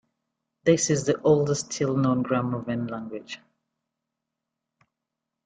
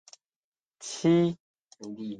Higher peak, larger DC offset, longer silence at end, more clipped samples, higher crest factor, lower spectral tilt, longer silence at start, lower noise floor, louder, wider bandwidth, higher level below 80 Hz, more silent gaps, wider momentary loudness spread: first, -8 dBFS vs -12 dBFS; neither; first, 2.1 s vs 0 s; neither; about the same, 20 dB vs 18 dB; about the same, -5.5 dB/octave vs -6 dB/octave; second, 0.65 s vs 0.8 s; second, -85 dBFS vs under -90 dBFS; about the same, -25 LUFS vs -26 LUFS; about the same, 9.6 kHz vs 9.6 kHz; first, -64 dBFS vs -70 dBFS; second, none vs 1.40-1.54 s, 1.64-1.68 s; second, 15 LU vs 20 LU